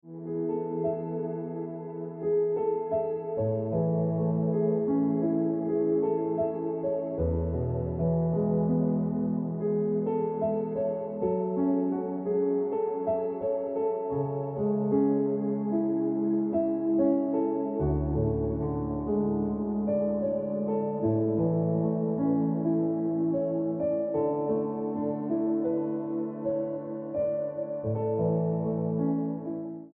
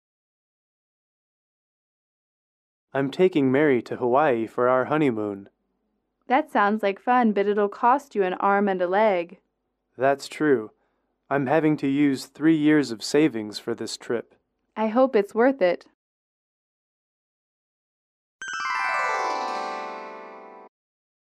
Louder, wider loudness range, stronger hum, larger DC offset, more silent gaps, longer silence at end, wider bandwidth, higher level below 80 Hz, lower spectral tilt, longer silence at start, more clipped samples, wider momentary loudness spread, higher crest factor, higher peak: second, -29 LUFS vs -23 LUFS; second, 3 LU vs 7 LU; neither; neither; second, none vs 15.94-18.39 s; second, 0.05 s vs 0.65 s; second, 2.8 kHz vs 13 kHz; first, -50 dBFS vs -74 dBFS; first, -13.5 dB/octave vs -6 dB/octave; second, 0.05 s vs 2.95 s; neither; second, 5 LU vs 11 LU; about the same, 14 dB vs 18 dB; second, -14 dBFS vs -8 dBFS